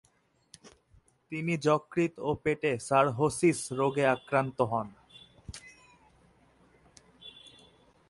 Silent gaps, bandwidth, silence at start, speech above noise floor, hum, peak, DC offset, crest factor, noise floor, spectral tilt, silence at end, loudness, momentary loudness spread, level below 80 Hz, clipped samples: none; 11.5 kHz; 0.65 s; 41 dB; none; -12 dBFS; under 0.1%; 20 dB; -69 dBFS; -5.5 dB/octave; 0.8 s; -29 LUFS; 22 LU; -62 dBFS; under 0.1%